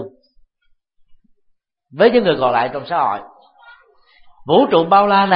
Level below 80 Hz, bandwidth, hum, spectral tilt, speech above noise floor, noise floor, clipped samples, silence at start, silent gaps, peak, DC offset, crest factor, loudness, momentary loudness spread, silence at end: -58 dBFS; 5.2 kHz; none; -10.5 dB/octave; 49 dB; -63 dBFS; under 0.1%; 0 s; none; 0 dBFS; under 0.1%; 18 dB; -15 LUFS; 13 LU; 0 s